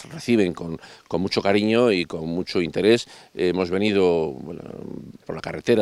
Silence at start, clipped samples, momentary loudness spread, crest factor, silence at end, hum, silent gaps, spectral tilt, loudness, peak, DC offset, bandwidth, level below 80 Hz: 0 s; under 0.1%; 17 LU; 18 dB; 0 s; none; none; -6 dB/octave; -22 LUFS; -4 dBFS; under 0.1%; 12.5 kHz; -58 dBFS